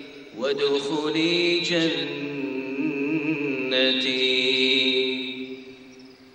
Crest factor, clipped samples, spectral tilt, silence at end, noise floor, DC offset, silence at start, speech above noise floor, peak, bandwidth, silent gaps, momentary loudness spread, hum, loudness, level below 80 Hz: 18 dB; under 0.1%; -4 dB/octave; 0.1 s; -47 dBFS; under 0.1%; 0 s; 24 dB; -8 dBFS; 9.6 kHz; none; 11 LU; none; -23 LUFS; -70 dBFS